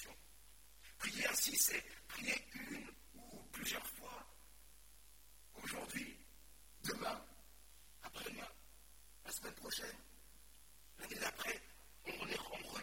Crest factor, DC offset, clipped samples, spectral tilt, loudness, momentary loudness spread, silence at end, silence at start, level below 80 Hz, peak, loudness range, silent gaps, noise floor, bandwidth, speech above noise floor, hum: 30 dB; under 0.1%; under 0.1%; -1 dB/octave; -43 LUFS; 25 LU; 0 s; 0 s; -68 dBFS; -18 dBFS; 10 LU; none; -65 dBFS; 16.5 kHz; 22 dB; none